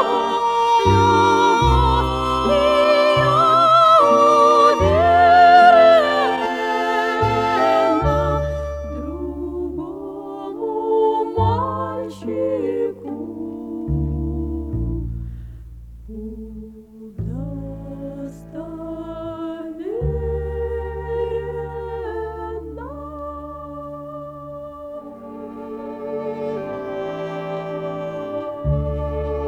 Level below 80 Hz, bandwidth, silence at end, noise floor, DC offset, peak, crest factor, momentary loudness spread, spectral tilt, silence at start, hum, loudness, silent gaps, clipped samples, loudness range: -34 dBFS; 13.5 kHz; 0 s; -39 dBFS; under 0.1%; -2 dBFS; 18 dB; 21 LU; -6 dB/octave; 0 s; none; -18 LUFS; none; under 0.1%; 19 LU